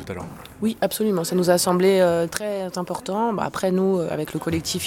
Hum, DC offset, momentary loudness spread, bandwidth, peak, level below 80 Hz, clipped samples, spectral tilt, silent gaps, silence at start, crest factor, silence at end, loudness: none; under 0.1%; 10 LU; 18.5 kHz; -4 dBFS; -54 dBFS; under 0.1%; -5 dB/octave; none; 0 s; 18 dB; 0 s; -22 LUFS